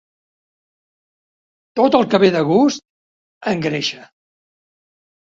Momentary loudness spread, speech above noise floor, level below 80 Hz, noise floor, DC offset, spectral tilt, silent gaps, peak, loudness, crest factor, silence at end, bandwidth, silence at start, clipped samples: 14 LU; over 75 dB; -60 dBFS; under -90 dBFS; under 0.1%; -5.5 dB/octave; 2.90-3.41 s; 0 dBFS; -16 LUFS; 20 dB; 1.2 s; 7.8 kHz; 1.75 s; under 0.1%